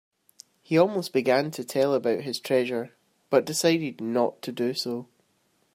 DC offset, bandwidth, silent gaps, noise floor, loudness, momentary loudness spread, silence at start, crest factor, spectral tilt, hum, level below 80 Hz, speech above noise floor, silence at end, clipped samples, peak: under 0.1%; 16 kHz; none; -69 dBFS; -26 LUFS; 8 LU; 0.7 s; 20 dB; -4.5 dB/octave; none; -76 dBFS; 44 dB; 0.7 s; under 0.1%; -6 dBFS